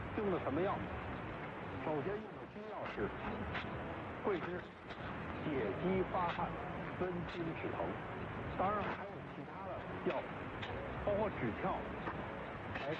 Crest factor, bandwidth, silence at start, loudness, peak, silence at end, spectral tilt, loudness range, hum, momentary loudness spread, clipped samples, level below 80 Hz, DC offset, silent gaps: 16 dB; 8.2 kHz; 0 s; -41 LUFS; -24 dBFS; 0 s; -8 dB/octave; 3 LU; none; 8 LU; under 0.1%; -58 dBFS; under 0.1%; none